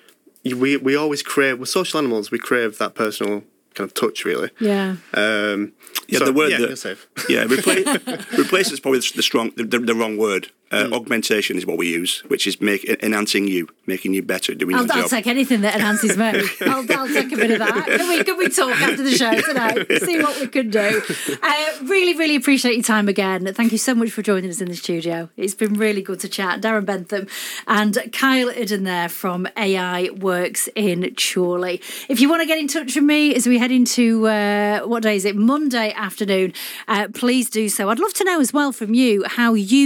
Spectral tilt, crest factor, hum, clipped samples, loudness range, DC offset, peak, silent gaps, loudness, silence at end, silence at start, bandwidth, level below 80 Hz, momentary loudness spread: -3.5 dB/octave; 18 dB; none; under 0.1%; 4 LU; under 0.1%; -2 dBFS; none; -19 LUFS; 0 s; 0.45 s; 19 kHz; -80 dBFS; 8 LU